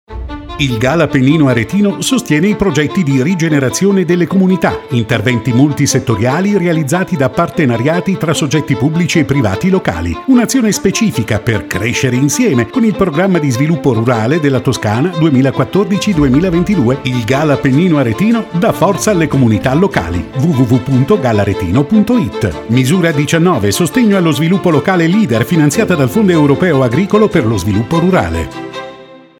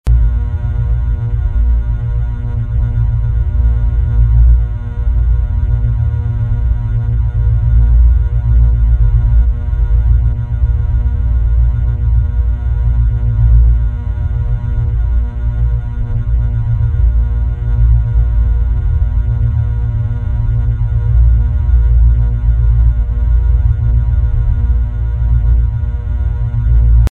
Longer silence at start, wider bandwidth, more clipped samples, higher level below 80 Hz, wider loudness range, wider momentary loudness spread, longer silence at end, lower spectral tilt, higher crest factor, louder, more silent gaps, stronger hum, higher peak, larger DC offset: about the same, 0.1 s vs 0.05 s; first, 17.5 kHz vs 2.3 kHz; neither; second, -36 dBFS vs -12 dBFS; about the same, 2 LU vs 3 LU; about the same, 4 LU vs 6 LU; first, 0.25 s vs 0.05 s; second, -6 dB/octave vs -10 dB/octave; about the same, 12 dB vs 12 dB; first, -12 LUFS vs -15 LUFS; neither; second, none vs 60 Hz at -30 dBFS; about the same, 0 dBFS vs 0 dBFS; neither